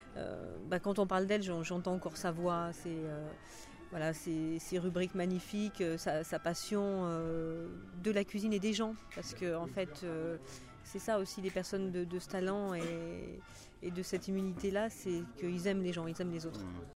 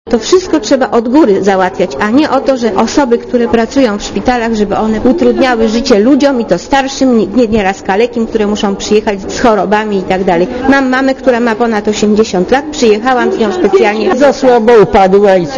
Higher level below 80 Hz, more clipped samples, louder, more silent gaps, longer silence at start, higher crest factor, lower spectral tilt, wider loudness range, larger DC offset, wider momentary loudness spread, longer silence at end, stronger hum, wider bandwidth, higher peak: second, -60 dBFS vs -34 dBFS; second, under 0.1% vs 1%; second, -38 LUFS vs -9 LUFS; neither; about the same, 0 s vs 0.05 s; first, 18 dB vs 8 dB; about the same, -5.5 dB/octave vs -5 dB/octave; about the same, 2 LU vs 2 LU; second, under 0.1% vs 0.2%; first, 11 LU vs 5 LU; about the same, 0.05 s vs 0 s; neither; first, 16 kHz vs 7.8 kHz; second, -20 dBFS vs 0 dBFS